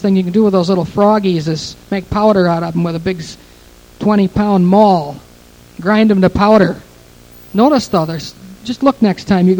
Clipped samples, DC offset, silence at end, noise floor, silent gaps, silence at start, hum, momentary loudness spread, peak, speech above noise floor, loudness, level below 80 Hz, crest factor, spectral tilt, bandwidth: under 0.1%; under 0.1%; 0 s; -41 dBFS; none; 0 s; none; 15 LU; 0 dBFS; 29 dB; -13 LUFS; -40 dBFS; 14 dB; -7 dB/octave; 18.5 kHz